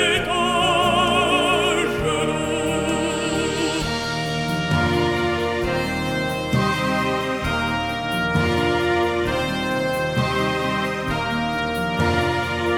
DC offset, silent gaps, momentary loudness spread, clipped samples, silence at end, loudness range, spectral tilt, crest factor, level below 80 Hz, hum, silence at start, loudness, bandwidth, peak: under 0.1%; none; 6 LU; under 0.1%; 0 s; 3 LU; -4.5 dB/octave; 14 dB; -40 dBFS; none; 0 s; -21 LUFS; 20 kHz; -6 dBFS